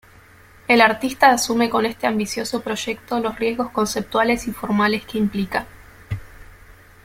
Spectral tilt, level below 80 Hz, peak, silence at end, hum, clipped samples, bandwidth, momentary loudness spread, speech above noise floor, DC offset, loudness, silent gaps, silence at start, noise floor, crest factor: -4 dB/octave; -48 dBFS; -2 dBFS; 0.3 s; none; under 0.1%; 16.5 kHz; 14 LU; 28 dB; under 0.1%; -20 LUFS; none; 0.7 s; -48 dBFS; 20 dB